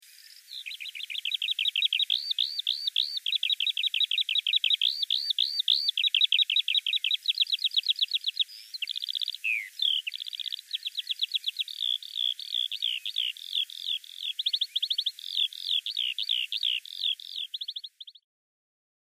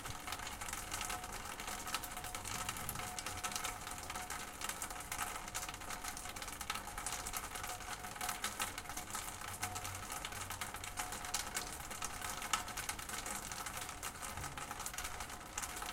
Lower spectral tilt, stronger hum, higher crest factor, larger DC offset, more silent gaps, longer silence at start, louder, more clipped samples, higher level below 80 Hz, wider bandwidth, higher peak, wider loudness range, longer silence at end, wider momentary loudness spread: second, 11.5 dB/octave vs -1.5 dB/octave; neither; second, 20 dB vs 26 dB; neither; neither; first, 0.15 s vs 0 s; first, -27 LUFS vs -42 LUFS; neither; second, under -90 dBFS vs -56 dBFS; about the same, 15.5 kHz vs 17 kHz; first, -12 dBFS vs -18 dBFS; first, 6 LU vs 1 LU; first, 0.9 s vs 0 s; first, 10 LU vs 4 LU